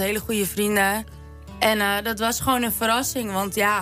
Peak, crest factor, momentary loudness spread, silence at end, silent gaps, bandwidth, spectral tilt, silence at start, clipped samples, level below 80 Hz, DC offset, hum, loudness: -4 dBFS; 18 dB; 5 LU; 0 s; none; 16 kHz; -3 dB/octave; 0 s; under 0.1%; -44 dBFS; under 0.1%; none; -22 LUFS